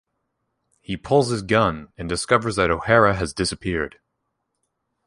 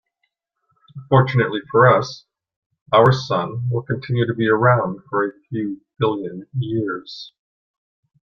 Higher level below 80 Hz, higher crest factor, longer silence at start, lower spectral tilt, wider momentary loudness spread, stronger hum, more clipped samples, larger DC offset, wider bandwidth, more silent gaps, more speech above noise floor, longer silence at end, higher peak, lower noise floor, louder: first, -44 dBFS vs -56 dBFS; about the same, 20 dB vs 18 dB; about the same, 0.9 s vs 0.95 s; second, -5 dB/octave vs -7.5 dB/octave; about the same, 14 LU vs 14 LU; neither; neither; neither; first, 11.5 kHz vs 6.8 kHz; second, none vs 2.56-2.70 s, 2.82-2.86 s; about the same, 56 dB vs 55 dB; first, 1.2 s vs 0.95 s; about the same, -2 dBFS vs -2 dBFS; about the same, -76 dBFS vs -74 dBFS; about the same, -21 LUFS vs -19 LUFS